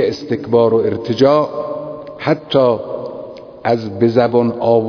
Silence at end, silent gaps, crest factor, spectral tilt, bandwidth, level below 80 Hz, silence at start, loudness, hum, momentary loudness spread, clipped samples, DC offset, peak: 0 s; none; 16 dB; -7.5 dB/octave; 5.4 kHz; -54 dBFS; 0 s; -16 LUFS; none; 14 LU; under 0.1%; under 0.1%; 0 dBFS